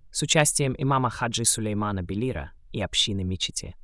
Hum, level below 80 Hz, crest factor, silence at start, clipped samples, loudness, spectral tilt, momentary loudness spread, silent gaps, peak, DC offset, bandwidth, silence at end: none; -46 dBFS; 20 dB; 0.05 s; under 0.1%; -24 LUFS; -3.5 dB/octave; 10 LU; none; -6 dBFS; under 0.1%; 12 kHz; 0.05 s